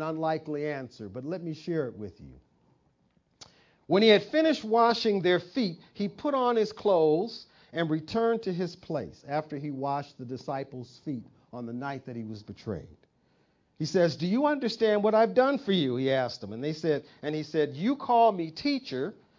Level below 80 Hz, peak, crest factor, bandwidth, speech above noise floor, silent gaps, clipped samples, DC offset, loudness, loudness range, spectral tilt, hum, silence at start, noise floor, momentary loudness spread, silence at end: -66 dBFS; -8 dBFS; 20 dB; 7.6 kHz; 42 dB; none; under 0.1%; under 0.1%; -28 LUFS; 11 LU; -6.5 dB/octave; none; 0 s; -69 dBFS; 16 LU; 0.25 s